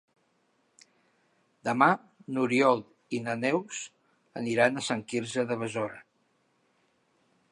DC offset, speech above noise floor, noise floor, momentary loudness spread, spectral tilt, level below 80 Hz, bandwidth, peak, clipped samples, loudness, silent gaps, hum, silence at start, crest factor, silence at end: under 0.1%; 44 dB; -71 dBFS; 14 LU; -5 dB/octave; -76 dBFS; 11.5 kHz; -6 dBFS; under 0.1%; -29 LUFS; none; none; 1.65 s; 24 dB; 1.5 s